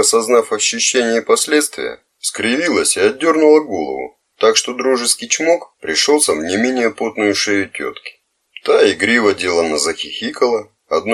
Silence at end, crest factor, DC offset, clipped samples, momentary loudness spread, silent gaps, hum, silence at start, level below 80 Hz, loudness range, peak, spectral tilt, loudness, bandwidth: 0 s; 16 dB; under 0.1%; under 0.1%; 11 LU; none; none; 0 s; -58 dBFS; 2 LU; 0 dBFS; -1.5 dB/octave; -15 LUFS; 15.5 kHz